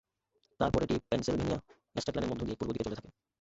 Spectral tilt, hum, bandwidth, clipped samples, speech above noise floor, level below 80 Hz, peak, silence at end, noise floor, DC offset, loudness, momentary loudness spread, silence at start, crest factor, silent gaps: -6 dB/octave; none; 8.2 kHz; under 0.1%; 43 dB; -50 dBFS; -14 dBFS; 0.3 s; -77 dBFS; under 0.1%; -34 LUFS; 8 LU; 0.6 s; 20 dB; none